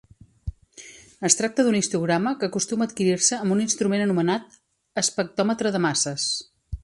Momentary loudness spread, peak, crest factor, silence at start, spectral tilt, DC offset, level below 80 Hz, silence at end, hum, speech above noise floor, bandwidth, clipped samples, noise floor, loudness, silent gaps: 18 LU; 0 dBFS; 24 dB; 0.45 s; -3.5 dB/octave; under 0.1%; -48 dBFS; 0.05 s; none; 24 dB; 11.5 kHz; under 0.1%; -47 dBFS; -23 LUFS; none